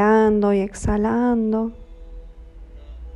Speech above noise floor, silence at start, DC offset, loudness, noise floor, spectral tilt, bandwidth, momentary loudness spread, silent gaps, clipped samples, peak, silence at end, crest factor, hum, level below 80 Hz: 20 dB; 0 s; under 0.1%; -20 LUFS; -40 dBFS; -7.5 dB/octave; 11 kHz; 10 LU; none; under 0.1%; -6 dBFS; 0 s; 16 dB; none; -36 dBFS